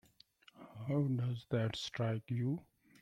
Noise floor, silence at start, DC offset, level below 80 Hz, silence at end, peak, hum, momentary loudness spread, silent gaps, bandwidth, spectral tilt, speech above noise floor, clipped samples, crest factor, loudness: -66 dBFS; 0.6 s; under 0.1%; -70 dBFS; 0.4 s; -24 dBFS; none; 12 LU; none; 9.6 kHz; -7 dB/octave; 29 dB; under 0.1%; 14 dB; -38 LUFS